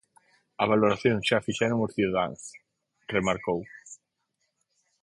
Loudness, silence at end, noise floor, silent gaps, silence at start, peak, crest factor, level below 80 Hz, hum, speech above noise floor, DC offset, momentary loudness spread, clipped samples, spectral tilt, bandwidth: -27 LUFS; 1.1 s; -78 dBFS; none; 0.6 s; -8 dBFS; 20 dB; -60 dBFS; none; 52 dB; under 0.1%; 21 LU; under 0.1%; -5.5 dB/octave; 11.5 kHz